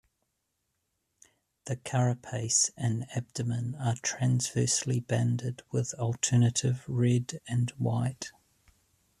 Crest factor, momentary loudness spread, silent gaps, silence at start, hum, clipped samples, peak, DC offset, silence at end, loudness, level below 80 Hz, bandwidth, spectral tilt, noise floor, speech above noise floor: 18 dB; 9 LU; none; 1.65 s; none; under 0.1%; -12 dBFS; under 0.1%; 0.9 s; -29 LUFS; -64 dBFS; 12.5 kHz; -4.5 dB/octave; -80 dBFS; 51 dB